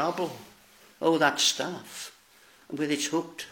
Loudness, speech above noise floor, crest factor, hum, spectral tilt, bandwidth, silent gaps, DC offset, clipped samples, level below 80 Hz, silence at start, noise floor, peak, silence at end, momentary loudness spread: -27 LUFS; 30 dB; 22 dB; none; -2.5 dB/octave; 17 kHz; none; under 0.1%; under 0.1%; -76 dBFS; 0 s; -58 dBFS; -8 dBFS; 0 s; 18 LU